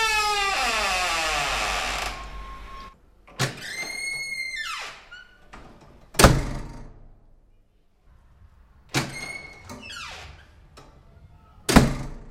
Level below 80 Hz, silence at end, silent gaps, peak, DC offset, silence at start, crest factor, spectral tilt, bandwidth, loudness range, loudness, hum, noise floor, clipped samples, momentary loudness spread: -36 dBFS; 0 s; none; 0 dBFS; under 0.1%; 0 s; 28 dB; -3.5 dB/octave; 16 kHz; 10 LU; -24 LUFS; none; -60 dBFS; under 0.1%; 23 LU